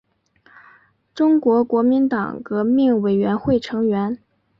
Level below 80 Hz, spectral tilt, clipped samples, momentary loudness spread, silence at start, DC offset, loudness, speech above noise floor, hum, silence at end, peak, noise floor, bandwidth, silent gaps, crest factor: -54 dBFS; -8.5 dB/octave; under 0.1%; 8 LU; 1.15 s; under 0.1%; -19 LUFS; 39 dB; none; 0.45 s; -6 dBFS; -57 dBFS; 7 kHz; none; 12 dB